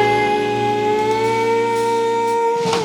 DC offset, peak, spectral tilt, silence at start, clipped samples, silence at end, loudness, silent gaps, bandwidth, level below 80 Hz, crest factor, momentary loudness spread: under 0.1%; -4 dBFS; -4.5 dB/octave; 0 s; under 0.1%; 0 s; -17 LUFS; none; 17.5 kHz; -54 dBFS; 12 dB; 1 LU